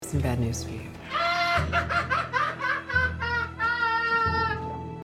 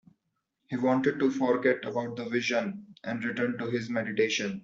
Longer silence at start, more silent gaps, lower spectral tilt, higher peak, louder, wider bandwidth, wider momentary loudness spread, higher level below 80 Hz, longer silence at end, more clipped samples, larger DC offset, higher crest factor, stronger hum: second, 0 s vs 0.7 s; neither; about the same, -4.5 dB/octave vs -5 dB/octave; about the same, -12 dBFS vs -12 dBFS; first, -26 LUFS vs -29 LUFS; first, 16 kHz vs 7.6 kHz; about the same, 9 LU vs 8 LU; first, -44 dBFS vs -72 dBFS; about the same, 0 s vs 0.05 s; neither; neither; about the same, 16 dB vs 18 dB; neither